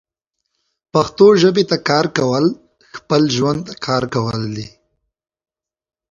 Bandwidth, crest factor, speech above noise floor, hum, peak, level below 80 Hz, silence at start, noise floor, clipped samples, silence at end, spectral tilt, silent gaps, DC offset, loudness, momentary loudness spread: 7.4 kHz; 18 dB; 61 dB; none; 0 dBFS; -52 dBFS; 0.95 s; -76 dBFS; under 0.1%; 1.45 s; -5.5 dB/octave; none; under 0.1%; -16 LUFS; 18 LU